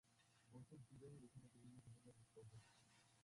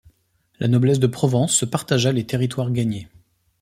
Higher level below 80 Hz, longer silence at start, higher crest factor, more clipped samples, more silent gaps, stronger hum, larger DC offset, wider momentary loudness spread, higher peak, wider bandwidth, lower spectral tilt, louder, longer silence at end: second, -84 dBFS vs -54 dBFS; second, 0.05 s vs 0.6 s; about the same, 16 dB vs 18 dB; neither; neither; neither; neither; about the same, 5 LU vs 7 LU; second, -50 dBFS vs -4 dBFS; second, 11.5 kHz vs 16 kHz; about the same, -6 dB/octave vs -5 dB/octave; second, -66 LUFS vs -20 LUFS; second, 0 s vs 0.55 s